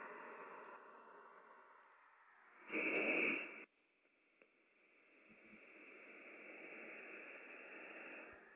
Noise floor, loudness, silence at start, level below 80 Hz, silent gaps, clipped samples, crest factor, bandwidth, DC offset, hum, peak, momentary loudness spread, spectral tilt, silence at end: -79 dBFS; -45 LUFS; 0 s; under -90 dBFS; none; under 0.1%; 22 dB; 4 kHz; under 0.1%; none; -28 dBFS; 26 LU; -1.5 dB/octave; 0 s